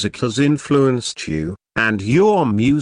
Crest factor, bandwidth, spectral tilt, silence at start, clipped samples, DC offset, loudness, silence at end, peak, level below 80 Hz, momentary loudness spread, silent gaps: 14 dB; 10 kHz; -6 dB/octave; 0 s; under 0.1%; under 0.1%; -17 LUFS; 0 s; -4 dBFS; -46 dBFS; 9 LU; none